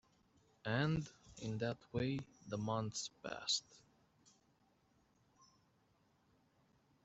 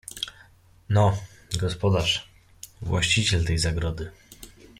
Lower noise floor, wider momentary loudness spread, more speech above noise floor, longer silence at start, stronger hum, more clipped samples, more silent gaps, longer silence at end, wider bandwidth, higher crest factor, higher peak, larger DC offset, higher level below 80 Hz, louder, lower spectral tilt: first, -76 dBFS vs -54 dBFS; second, 9 LU vs 24 LU; about the same, 34 dB vs 31 dB; first, 0.65 s vs 0.15 s; neither; neither; neither; first, 3.25 s vs 0.35 s; second, 8.2 kHz vs 16 kHz; about the same, 22 dB vs 18 dB; second, -24 dBFS vs -8 dBFS; neither; second, -70 dBFS vs -42 dBFS; second, -42 LUFS vs -25 LUFS; about the same, -4.5 dB/octave vs -4.5 dB/octave